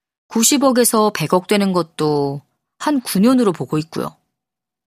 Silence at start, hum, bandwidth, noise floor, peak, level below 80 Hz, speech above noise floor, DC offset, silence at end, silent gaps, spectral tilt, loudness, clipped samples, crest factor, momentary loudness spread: 0.3 s; none; 15.5 kHz; -85 dBFS; 0 dBFS; -60 dBFS; 68 dB; under 0.1%; 0.8 s; none; -4.5 dB/octave; -17 LUFS; under 0.1%; 18 dB; 11 LU